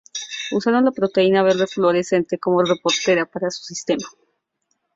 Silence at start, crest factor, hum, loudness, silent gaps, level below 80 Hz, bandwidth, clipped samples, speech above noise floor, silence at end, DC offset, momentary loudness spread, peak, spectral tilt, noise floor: 0.15 s; 16 dB; none; -19 LUFS; none; -64 dBFS; 7.8 kHz; under 0.1%; 53 dB; 0.85 s; under 0.1%; 9 LU; -4 dBFS; -4.5 dB/octave; -72 dBFS